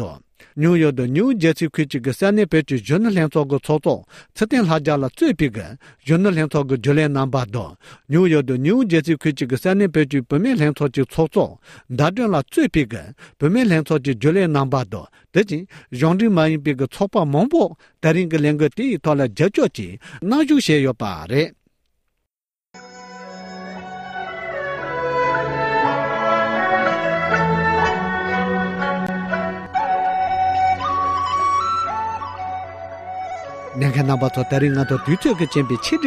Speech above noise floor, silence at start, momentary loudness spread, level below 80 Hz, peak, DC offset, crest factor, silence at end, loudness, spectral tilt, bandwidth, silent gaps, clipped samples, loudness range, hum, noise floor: 67 dB; 0 s; 13 LU; -48 dBFS; -4 dBFS; under 0.1%; 16 dB; 0 s; -19 LUFS; -7 dB/octave; 14.5 kHz; none; under 0.1%; 4 LU; none; -85 dBFS